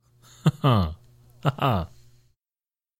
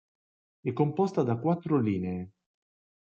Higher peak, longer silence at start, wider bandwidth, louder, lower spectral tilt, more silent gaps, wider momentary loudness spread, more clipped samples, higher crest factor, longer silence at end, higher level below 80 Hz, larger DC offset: first, -6 dBFS vs -12 dBFS; second, 0.45 s vs 0.65 s; first, 15.5 kHz vs 7.4 kHz; first, -25 LUFS vs -29 LUFS; second, -7.5 dB/octave vs -9.5 dB/octave; neither; first, 13 LU vs 10 LU; neither; about the same, 22 dB vs 18 dB; first, 1.15 s vs 0.75 s; first, -46 dBFS vs -74 dBFS; neither